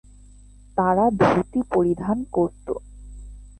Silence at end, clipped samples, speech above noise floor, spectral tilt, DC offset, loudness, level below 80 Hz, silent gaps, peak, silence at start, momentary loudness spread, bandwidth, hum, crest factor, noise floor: 0.1 s; under 0.1%; 26 dB; -8 dB/octave; under 0.1%; -22 LUFS; -44 dBFS; none; -4 dBFS; 0.75 s; 18 LU; 9 kHz; 50 Hz at -45 dBFS; 18 dB; -47 dBFS